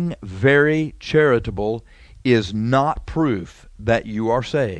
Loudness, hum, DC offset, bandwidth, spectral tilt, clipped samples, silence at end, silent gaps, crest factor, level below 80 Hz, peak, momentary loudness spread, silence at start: -20 LUFS; none; under 0.1%; 9.6 kHz; -7 dB/octave; under 0.1%; 0 s; none; 18 dB; -40 dBFS; -2 dBFS; 11 LU; 0 s